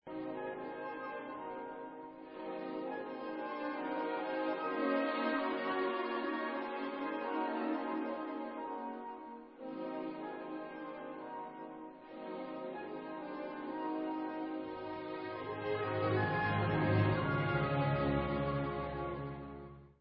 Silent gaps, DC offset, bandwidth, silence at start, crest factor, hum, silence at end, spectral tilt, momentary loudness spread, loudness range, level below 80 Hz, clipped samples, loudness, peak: none; under 0.1%; 5.4 kHz; 0.05 s; 20 dB; none; 0.1 s; -5.5 dB/octave; 13 LU; 11 LU; -60 dBFS; under 0.1%; -38 LUFS; -18 dBFS